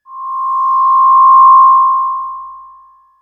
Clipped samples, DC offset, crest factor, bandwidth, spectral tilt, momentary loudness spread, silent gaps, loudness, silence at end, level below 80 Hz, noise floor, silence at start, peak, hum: under 0.1%; under 0.1%; 10 dB; 1.3 kHz; -2.5 dB/octave; 18 LU; none; -8 LUFS; 0.6 s; -62 dBFS; -43 dBFS; 0.1 s; 0 dBFS; none